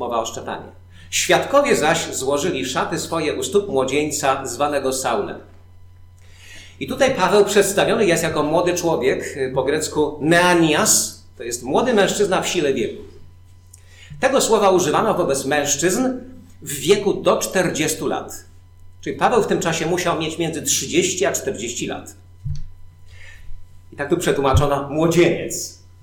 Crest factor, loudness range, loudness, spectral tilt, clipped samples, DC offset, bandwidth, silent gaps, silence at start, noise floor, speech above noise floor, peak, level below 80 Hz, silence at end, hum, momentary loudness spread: 16 dB; 5 LU; -19 LUFS; -3.5 dB/octave; under 0.1%; under 0.1%; 19 kHz; none; 0 s; -45 dBFS; 26 dB; -4 dBFS; -42 dBFS; 0.25 s; none; 14 LU